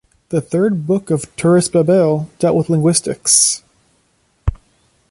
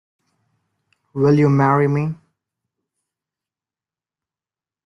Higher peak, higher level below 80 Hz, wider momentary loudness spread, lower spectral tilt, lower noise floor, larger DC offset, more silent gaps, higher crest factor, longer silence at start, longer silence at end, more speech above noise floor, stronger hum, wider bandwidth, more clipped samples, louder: first, 0 dBFS vs -4 dBFS; first, -34 dBFS vs -60 dBFS; second, 14 LU vs 17 LU; second, -4.5 dB/octave vs -9.5 dB/octave; second, -60 dBFS vs under -90 dBFS; neither; neither; about the same, 16 dB vs 18 dB; second, 0.3 s vs 1.15 s; second, 0.55 s vs 2.7 s; second, 45 dB vs over 75 dB; neither; first, 11.5 kHz vs 6.4 kHz; neither; about the same, -15 LUFS vs -17 LUFS